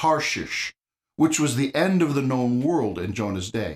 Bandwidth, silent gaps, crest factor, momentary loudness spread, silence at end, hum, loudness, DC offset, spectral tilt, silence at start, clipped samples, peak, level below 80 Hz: 15.5 kHz; none; 16 dB; 7 LU; 0 s; none; -23 LUFS; under 0.1%; -5 dB/octave; 0 s; under 0.1%; -8 dBFS; -56 dBFS